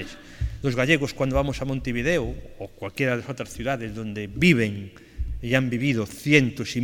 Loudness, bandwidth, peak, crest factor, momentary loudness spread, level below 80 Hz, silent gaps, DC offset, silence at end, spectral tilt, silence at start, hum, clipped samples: -24 LUFS; 17 kHz; -2 dBFS; 22 dB; 16 LU; -38 dBFS; none; under 0.1%; 0 s; -6 dB/octave; 0 s; none; under 0.1%